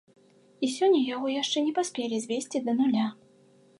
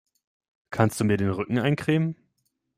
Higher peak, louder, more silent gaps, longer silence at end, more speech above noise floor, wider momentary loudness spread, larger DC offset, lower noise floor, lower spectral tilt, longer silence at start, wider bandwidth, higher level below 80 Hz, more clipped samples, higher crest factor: second, -14 dBFS vs -6 dBFS; about the same, -27 LUFS vs -25 LUFS; neither; about the same, 0.65 s vs 0.65 s; second, 33 dB vs 52 dB; about the same, 8 LU vs 9 LU; neither; second, -59 dBFS vs -75 dBFS; second, -4 dB/octave vs -6.5 dB/octave; about the same, 0.6 s vs 0.7 s; second, 11.5 kHz vs 16 kHz; second, -84 dBFS vs -58 dBFS; neither; second, 14 dB vs 22 dB